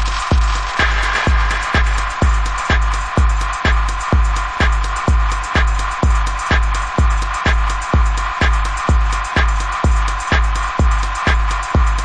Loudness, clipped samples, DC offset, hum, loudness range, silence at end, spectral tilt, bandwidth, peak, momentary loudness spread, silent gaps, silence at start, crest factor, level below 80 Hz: -17 LUFS; under 0.1%; under 0.1%; none; 1 LU; 0 s; -4.5 dB/octave; 10 kHz; -2 dBFS; 2 LU; none; 0 s; 12 dB; -16 dBFS